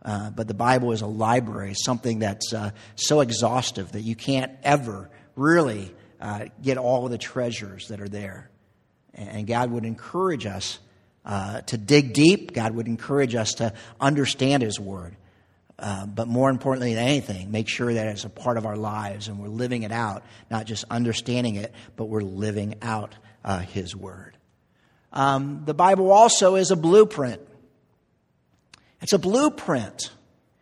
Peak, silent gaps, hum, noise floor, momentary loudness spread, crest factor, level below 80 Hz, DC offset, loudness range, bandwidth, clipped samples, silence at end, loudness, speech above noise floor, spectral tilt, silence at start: 0 dBFS; none; none; -67 dBFS; 16 LU; 24 dB; -60 dBFS; under 0.1%; 10 LU; 13.5 kHz; under 0.1%; 0.5 s; -23 LUFS; 44 dB; -5 dB/octave; 0.05 s